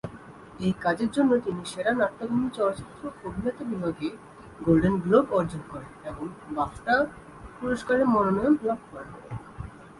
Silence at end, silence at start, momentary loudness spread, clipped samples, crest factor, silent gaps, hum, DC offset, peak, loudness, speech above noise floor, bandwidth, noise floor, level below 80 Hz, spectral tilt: 0 s; 0.05 s; 19 LU; under 0.1%; 18 dB; none; none; under 0.1%; -8 dBFS; -26 LUFS; 20 dB; 11.5 kHz; -46 dBFS; -52 dBFS; -7 dB/octave